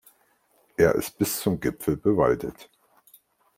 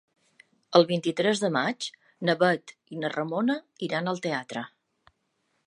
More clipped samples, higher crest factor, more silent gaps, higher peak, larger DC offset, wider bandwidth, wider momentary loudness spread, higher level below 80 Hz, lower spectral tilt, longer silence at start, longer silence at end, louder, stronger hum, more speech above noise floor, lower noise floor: neither; about the same, 20 dB vs 24 dB; neither; about the same, -6 dBFS vs -4 dBFS; neither; first, 16.5 kHz vs 11 kHz; second, 7 LU vs 14 LU; first, -52 dBFS vs -78 dBFS; about the same, -5.5 dB/octave vs -5 dB/octave; about the same, 0.8 s vs 0.7 s; about the same, 0.95 s vs 1 s; first, -24 LUFS vs -27 LUFS; neither; second, 41 dB vs 48 dB; second, -65 dBFS vs -75 dBFS